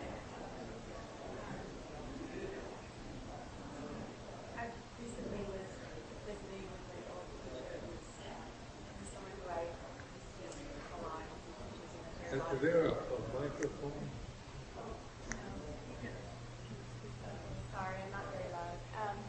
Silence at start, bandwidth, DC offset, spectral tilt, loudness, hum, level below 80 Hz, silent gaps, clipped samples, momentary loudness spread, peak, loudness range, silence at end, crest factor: 0 s; 8.4 kHz; under 0.1%; -5.5 dB/octave; -45 LUFS; none; -56 dBFS; none; under 0.1%; 9 LU; -20 dBFS; 9 LU; 0 s; 24 dB